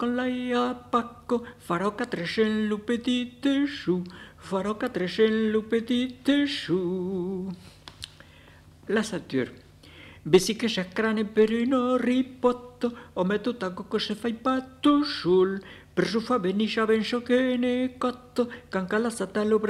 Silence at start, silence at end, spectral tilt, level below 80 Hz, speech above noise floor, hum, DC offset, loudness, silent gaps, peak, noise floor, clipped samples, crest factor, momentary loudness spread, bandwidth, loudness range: 0 s; 0 s; -5.5 dB/octave; -58 dBFS; 26 dB; 50 Hz at -60 dBFS; under 0.1%; -26 LUFS; none; -6 dBFS; -52 dBFS; under 0.1%; 22 dB; 9 LU; 13 kHz; 4 LU